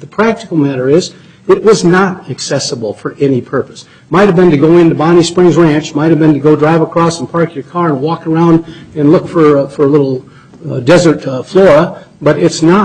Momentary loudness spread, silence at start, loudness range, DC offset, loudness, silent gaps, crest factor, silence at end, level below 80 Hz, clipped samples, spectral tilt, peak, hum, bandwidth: 10 LU; 0 s; 3 LU; under 0.1%; -10 LUFS; none; 10 dB; 0 s; -44 dBFS; under 0.1%; -6.5 dB/octave; 0 dBFS; none; 9.4 kHz